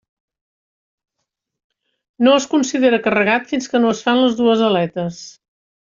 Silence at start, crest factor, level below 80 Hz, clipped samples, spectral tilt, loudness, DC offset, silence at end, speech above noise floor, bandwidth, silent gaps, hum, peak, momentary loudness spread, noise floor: 2.2 s; 16 dB; -62 dBFS; under 0.1%; -4.5 dB/octave; -16 LUFS; under 0.1%; 0.6 s; 62 dB; 7.6 kHz; none; none; -2 dBFS; 8 LU; -77 dBFS